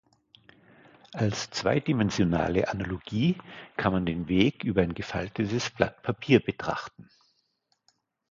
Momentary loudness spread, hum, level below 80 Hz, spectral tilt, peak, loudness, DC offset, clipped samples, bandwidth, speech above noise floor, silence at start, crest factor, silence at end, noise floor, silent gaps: 10 LU; none; -50 dBFS; -6 dB/octave; -4 dBFS; -28 LUFS; under 0.1%; under 0.1%; 7.6 kHz; 47 dB; 1.15 s; 24 dB; 1.3 s; -74 dBFS; none